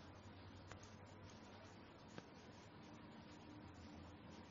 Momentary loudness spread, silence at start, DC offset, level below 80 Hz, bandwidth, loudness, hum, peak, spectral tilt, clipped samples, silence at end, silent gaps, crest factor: 2 LU; 0 s; under 0.1%; -74 dBFS; 7.4 kHz; -60 LUFS; none; -36 dBFS; -5 dB/octave; under 0.1%; 0 s; none; 24 dB